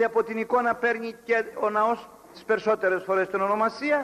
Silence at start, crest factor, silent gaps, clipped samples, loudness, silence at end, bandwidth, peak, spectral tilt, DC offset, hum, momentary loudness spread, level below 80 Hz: 0 s; 14 dB; none; under 0.1%; -25 LUFS; 0 s; 14 kHz; -12 dBFS; -5.5 dB/octave; under 0.1%; none; 4 LU; -68 dBFS